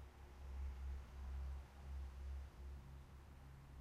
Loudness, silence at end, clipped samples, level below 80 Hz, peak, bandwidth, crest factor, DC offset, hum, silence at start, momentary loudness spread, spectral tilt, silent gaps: -54 LUFS; 0 s; under 0.1%; -52 dBFS; -40 dBFS; 12 kHz; 10 dB; under 0.1%; none; 0 s; 10 LU; -6.5 dB/octave; none